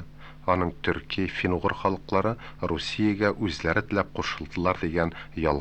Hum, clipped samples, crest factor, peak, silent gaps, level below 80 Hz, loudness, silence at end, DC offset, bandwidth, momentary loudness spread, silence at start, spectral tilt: none; under 0.1%; 20 dB; -8 dBFS; none; -44 dBFS; -27 LUFS; 0 s; under 0.1%; 8.8 kHz; 5 LU; 0 s; -6 dB/octave